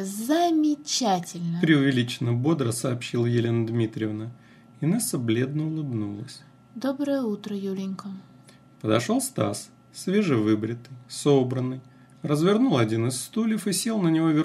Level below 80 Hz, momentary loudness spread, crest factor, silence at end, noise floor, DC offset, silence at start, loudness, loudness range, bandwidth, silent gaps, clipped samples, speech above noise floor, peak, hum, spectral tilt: -70 dBFS; 14 LU; 18 dB; 0 s; -52 dBFS; under 0.1%; 0 s; -25 LUFS; 5 LU; 15 kHz; none; under 0.1%; 28 dB; -6 dBFS; none; -5.5 dB/octave